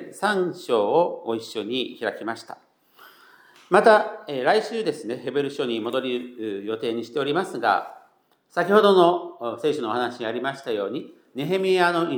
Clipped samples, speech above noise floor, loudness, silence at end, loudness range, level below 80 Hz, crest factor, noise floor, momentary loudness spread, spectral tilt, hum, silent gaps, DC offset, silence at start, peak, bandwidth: under 0.1%; 39 dB; -23 LUFS; 0 s; 4 LU; -86 dBFS; 22 dB; -61 dBFS; 14 LU; -5 dB/octave; none; none; under 0.1%; 0 s; -2 dBFS; 19.5 kHz